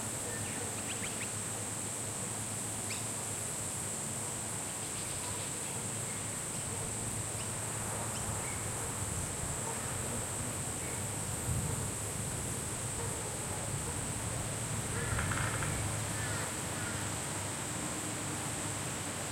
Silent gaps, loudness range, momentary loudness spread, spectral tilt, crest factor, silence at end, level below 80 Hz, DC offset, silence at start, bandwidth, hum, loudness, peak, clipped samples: none; 1 LU; 2 LU; -3 dB/octave; 18 dB; 0 s; -54 dBFS; under 0.1%; 0 s; 16.5 kHz; none; -36 LUFS; -20 dBFS; under 0.1%